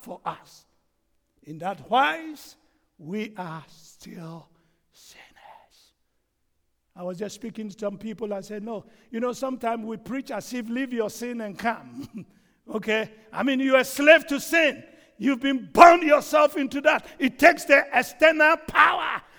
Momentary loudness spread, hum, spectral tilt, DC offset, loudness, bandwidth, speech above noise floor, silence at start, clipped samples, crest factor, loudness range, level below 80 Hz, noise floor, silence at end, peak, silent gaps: 20 LU; none; -4 dB/octave; under 0.1%; -21 LUFS; over 20 kHz; 50 dB; 0.05 s; under 0.1%; 24 dB; 21 LU; -60 dBFS; -73 dBFS; 0.2 s; 0 dBFS; none